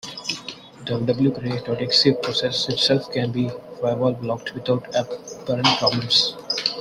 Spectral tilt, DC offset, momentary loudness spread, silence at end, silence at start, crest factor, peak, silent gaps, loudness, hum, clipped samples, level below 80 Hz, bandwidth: -4.5 dB/octave; under 0.1%; 11 LU; 0 s; 0.05 s; 20 dB; -2 dBFS; none; -21 LUFS; none; under 0.1%; -58 dBFS; 13.5 kHz